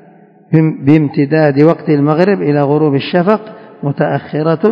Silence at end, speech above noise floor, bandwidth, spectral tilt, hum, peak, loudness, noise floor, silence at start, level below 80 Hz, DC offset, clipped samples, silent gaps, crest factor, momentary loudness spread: 0 s; 31 dB; 5.4 kHz; -10 dB/octave; none; 0 dBFS; -12 LUFS; -42 dBFS; 0.5 s; -58 dBFS; under 0.1%; 0.5%; none; 12 dB; 5 LU